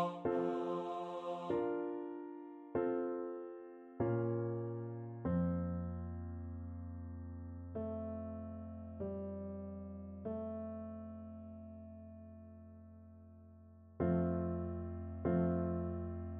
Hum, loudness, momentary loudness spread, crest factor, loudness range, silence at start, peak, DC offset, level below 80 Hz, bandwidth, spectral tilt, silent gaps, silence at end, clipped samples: none; -41 LUFS; 18 LU; 18 dB; 9 LU; 0 s; -24 dBFS; under 0.1%; -58 dBFS; 4.3 kHz; -10.5 dB/octave; none; 0 s; under 0.1%